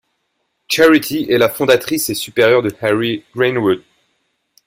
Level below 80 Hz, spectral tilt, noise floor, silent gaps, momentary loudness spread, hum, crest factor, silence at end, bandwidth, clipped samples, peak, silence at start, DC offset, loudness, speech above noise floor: -54 dBFS; -4 dB/octave; -69 dBFS; none; 7 LU; none; 16 dB; 0.9 s; 16.5 kHz; under 0.1%; 0 dBFS; 0.7 s; under 0.1%; -15 LUFS; 55 dB